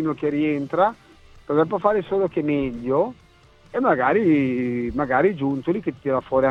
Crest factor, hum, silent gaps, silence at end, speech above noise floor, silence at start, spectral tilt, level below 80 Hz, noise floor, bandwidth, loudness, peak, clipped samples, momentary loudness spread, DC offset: 18 dB; none; none; 0 s; 30 dB; 0 s; -9 dB/octave; -50 dBFS; -51 dBFS; 6.6 kHz; -22 LUFS; -4 dBFS; under 0.1%; 6 LU; under 0.1%